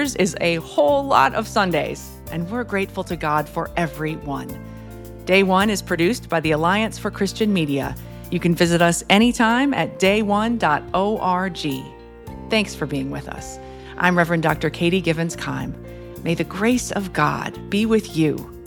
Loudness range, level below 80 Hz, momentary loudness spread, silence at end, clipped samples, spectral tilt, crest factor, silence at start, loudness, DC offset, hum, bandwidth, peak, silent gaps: 5 LU; -42 dBFS; 16 LU; 0 s; under 0.1%; -5 dB/octave; 20 dB; 0 s; -20 LUFS; under 0.1%; none; 19 kHz; 0 dBFS; none